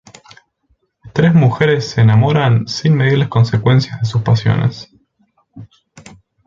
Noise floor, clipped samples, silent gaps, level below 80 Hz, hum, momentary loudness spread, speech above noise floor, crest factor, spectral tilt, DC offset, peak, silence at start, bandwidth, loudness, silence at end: -62 dBFS; under 0.1%; none; -46 dBFS; none; 7 LU; 49 dB; 14 dB; -7 dB/octave; under 0.1%; 0 dBFS; 1.05 s; 7.6 kHz; -14 LUFS; 0.85 s